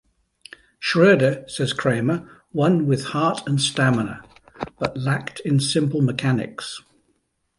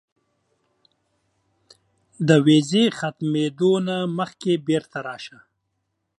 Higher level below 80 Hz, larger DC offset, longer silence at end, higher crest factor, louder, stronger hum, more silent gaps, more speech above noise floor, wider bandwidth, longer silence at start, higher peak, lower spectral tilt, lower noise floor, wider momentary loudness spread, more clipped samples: first, -56 dBFS vs -68 dBFS; neither; about the same, 0.8 s vs 0.9 s; about the same, 18 dB vs 20 dB; about the same, -21 LUFS vs -21 LUFS; neither; neither; second, 49 dB vs 55 dB; about the same, 11.5 kHz vs 11.5 kHz; second, 0.8 s vs 2.2 s; about the same, -4 dBFS vs -2 dBFS; about the same, -5.5 dB/octave vs -6 dB/octave; second, -69 dBFS vs -76 dBFS; about the same, 14 LU vs 16 LU; neither